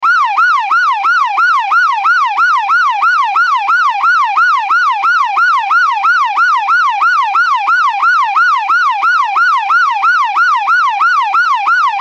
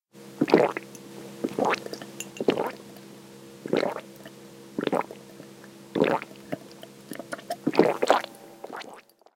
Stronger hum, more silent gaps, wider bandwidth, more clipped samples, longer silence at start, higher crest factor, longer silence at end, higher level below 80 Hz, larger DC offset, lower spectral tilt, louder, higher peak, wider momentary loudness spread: neither; neither; second, 8.8 kHz vs 17 kHz; neither; second, 0 s vs 0.15 s; second, 8 dB vs 26 dB; second, 0 s vs 0.35 s; about the same, -70 dBFS vs -72 dBFS; neither; second, 2 dB/octave vs -5 dB/octave; first, -10 LUFS vs -27 LUFS; about the same, -2 dBFS vs -2 dBFS; second, 1 LU vs 23 LU